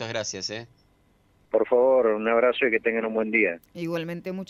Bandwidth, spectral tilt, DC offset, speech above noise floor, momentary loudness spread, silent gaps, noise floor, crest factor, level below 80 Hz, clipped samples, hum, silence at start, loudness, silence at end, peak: 12.5 kHz; -4.5 dB/octave; under 0.1%; 38 dB; 12 LU; none; -63 dBFS; 18 dB; -64 dBFS; under 0.1%; none; 0 s; -24 LUFS; 0.05 s; -8 dBFS